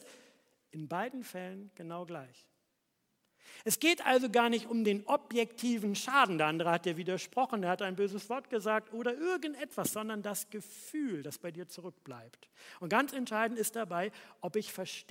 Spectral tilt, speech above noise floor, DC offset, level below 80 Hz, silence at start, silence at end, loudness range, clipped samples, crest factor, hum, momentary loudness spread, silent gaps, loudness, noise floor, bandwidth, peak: -3.5 dB/octave; 46 dB; under 0.1%; -86 dBFS; 0 s; 0.1 s; 10 LU; under 0.1%; 24 dB; none; 18 LU; none; -34 LUFS; -80 dBFS; 16.5 kHz; -12 dBFS